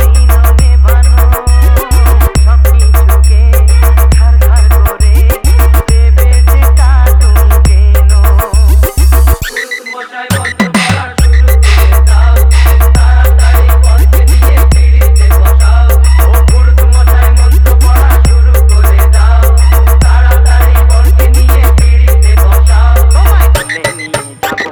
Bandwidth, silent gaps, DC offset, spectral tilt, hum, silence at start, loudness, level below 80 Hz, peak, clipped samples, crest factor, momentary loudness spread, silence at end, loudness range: 19.5 kHz; none; under 0.1%; -5.5 dB/octave; none; 0 s; -7 LUFS; -4 dBFS; 0 dBFS; 2%; 4 dB; 3 LU; 0 s; 2 LU